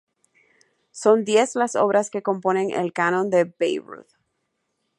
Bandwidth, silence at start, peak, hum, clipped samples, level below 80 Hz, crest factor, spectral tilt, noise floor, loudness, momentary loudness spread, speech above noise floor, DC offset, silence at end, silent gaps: 11.5 kHz; 0.95 s; -4 dBFS; none; under 0.1%; -76 dBFS; 20 dB; -4.5 dB/octave; -75 dBFS; -21 LUFS; 6 LU; 54 dB; under 0.1%; 0.95 s; none